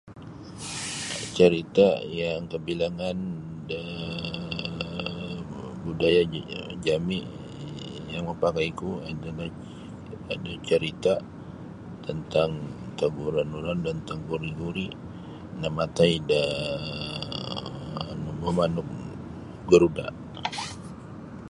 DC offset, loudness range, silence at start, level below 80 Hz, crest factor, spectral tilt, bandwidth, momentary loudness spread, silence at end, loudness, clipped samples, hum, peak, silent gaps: under 0.1%; 6 LU; 0.05 s; -50 dBFS; 24 dB; -5.5 dB/octave; 11.5 kHz; 19 LU; 0 s; -28 LUFS; under 0.1%; none; -4 dBFS; none